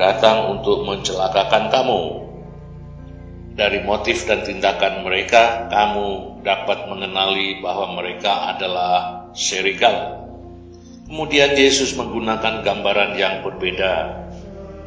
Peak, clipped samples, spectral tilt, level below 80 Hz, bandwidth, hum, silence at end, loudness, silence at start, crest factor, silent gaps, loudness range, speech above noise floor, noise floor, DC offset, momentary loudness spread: 0 dBFS; under 0.1%; -3 dB/octave; -42 dBFS; 8 kHz; none; 0 s; -18 LUFS; 0 s; 20 dB; none; 3 LU; 21 dB; -39 dBFS; under 0.1%; 21 LU